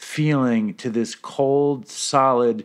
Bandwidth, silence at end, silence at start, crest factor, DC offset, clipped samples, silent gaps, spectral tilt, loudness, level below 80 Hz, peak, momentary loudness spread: 13 kHz; 0 s; 0 s; 16 dB; under 0.1%; under 0.1%; none; -5.5 dB/octave; -21 LUFS; -74 dBFS; -4 dBFS; 8 LU